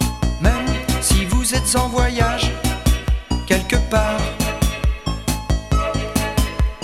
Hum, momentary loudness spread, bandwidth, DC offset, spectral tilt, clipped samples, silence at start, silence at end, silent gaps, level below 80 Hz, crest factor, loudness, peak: none; 6 LU; 16 kHz; under 0.1%; -4.5 dB/octave; under 0.1%; 0 s; 0 s; none; -22 dBFS; 18 dB; -19 LUFS; 0 dBFS